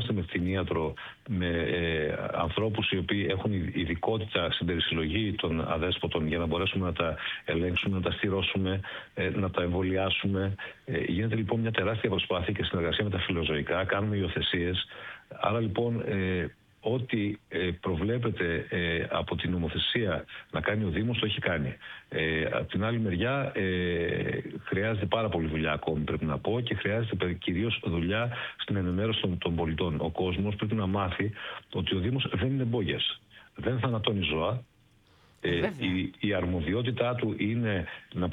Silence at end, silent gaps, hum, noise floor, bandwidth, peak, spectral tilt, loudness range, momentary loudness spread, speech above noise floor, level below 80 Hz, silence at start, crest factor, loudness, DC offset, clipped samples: 0 s; none; none; -62 dBFS; 4.6 kHz; -8 dBFS; -8.5 dB/octave; 2 LU; 5 LU; 33 dB; -48 dBFS; 0 s; 22 dB; -30 LUFS; under 0.1%; under 0.1%